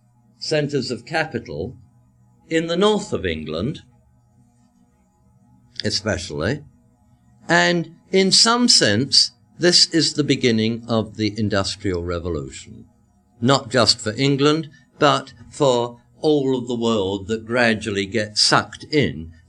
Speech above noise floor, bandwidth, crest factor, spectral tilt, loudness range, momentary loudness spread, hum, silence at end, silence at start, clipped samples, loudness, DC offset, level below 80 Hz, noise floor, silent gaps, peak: 39 dB; 12 kHz; 20 dB; -3.5 dB/octave; 12 LU; 14 LU; none; 0.2 s; 0.4 s; under 0.1%; -19 LUFS; under 0.1%; -50 dBFS; -58 dBFS; none; 0 dBFS